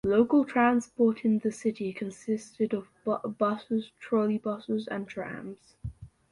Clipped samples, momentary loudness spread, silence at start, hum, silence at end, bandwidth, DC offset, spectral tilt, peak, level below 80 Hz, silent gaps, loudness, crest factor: under 0.1%; 15 LU; 0.05 s; none; 0.25 s; 11 kHz; under 0.1%; -6.5 dB/octave; -10 dBFS; -58 dBFS; none; -29 LUFS; 18 dB